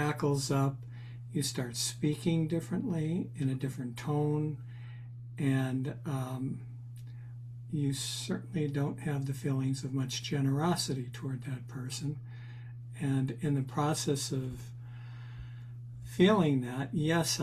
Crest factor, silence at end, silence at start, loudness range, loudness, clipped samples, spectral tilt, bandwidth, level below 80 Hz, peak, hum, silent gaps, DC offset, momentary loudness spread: 22 dB; 0 s; 0 s; 4 LU; -33 LUFS; under 0.1%; -5.5 dB/octave; 14.5 kHz; -62 dBFS; -12 dBFS; none; none; under 0.1%; 16 LU